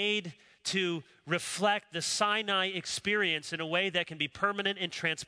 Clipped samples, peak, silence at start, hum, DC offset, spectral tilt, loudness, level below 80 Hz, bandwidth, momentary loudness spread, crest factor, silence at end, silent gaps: under 0.1%; -12 dBFS; 0 s; none; under 0.1%; -2.5 dB/octave; -31 LUFS; -72 dBFS; 11 kHz; 6 LU; 20 dB; 0.05 s; none